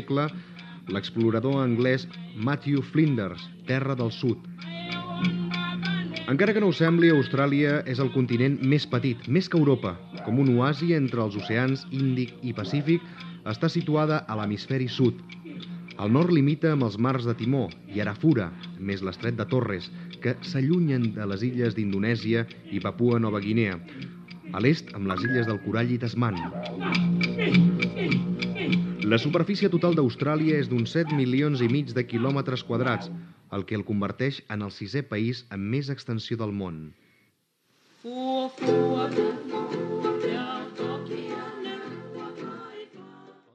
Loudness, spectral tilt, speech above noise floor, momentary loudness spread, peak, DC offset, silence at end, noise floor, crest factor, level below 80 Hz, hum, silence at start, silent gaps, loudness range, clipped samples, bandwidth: -26 LUFS; -8 dB/octave; 44 dB; 13 LU; -6 dBFS; under 0.1%; 0.25 s; -69 dBFS; 20 dB; -64 dBFS; none; 0 s; none; 6 LU; under 0.1%; 7.6 kHz